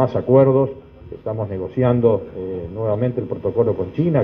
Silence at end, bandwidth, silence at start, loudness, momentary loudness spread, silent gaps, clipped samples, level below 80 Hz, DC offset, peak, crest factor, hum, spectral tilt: 0 s; 5.2 kHz; 0 s; -19 LUFS; 14 LU; none; under 0.1%; -48 dBFS; under 0.1%; -2 dBFS; 16 dB; none; -11.5 dB/octave